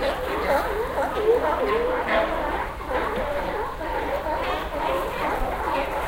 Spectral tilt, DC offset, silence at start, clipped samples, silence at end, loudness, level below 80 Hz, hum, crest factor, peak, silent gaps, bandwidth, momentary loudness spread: -5 dB/octave; under 0.1%; 0 s; under 0.1%; 0 s; -25 LUFS; -36 dBFS; none; 16 dB; -8 dBFS; none; 16.5 kHz; 6 LU